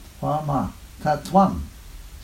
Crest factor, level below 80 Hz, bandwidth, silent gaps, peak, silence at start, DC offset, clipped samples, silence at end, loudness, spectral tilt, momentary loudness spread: 20 dB; -40 dBFS; 16 kHz; none; -4 dBFS; 0 s; under 0.1%; under 0.1%; 0 s; -23 LUFS; -7 dB/octave; 21 LU